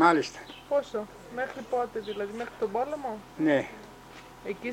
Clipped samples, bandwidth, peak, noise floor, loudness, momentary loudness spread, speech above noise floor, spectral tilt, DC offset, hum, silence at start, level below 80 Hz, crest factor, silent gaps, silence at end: under 0.1%; 16.5 kHz; -8 dBFS; -48 dBFS; -31 LUFS; 17 LU; 19 dB; -5 dB/octave; under 0.1%; none; 0 s; -62 dBFS; 22 dB; none; 0 s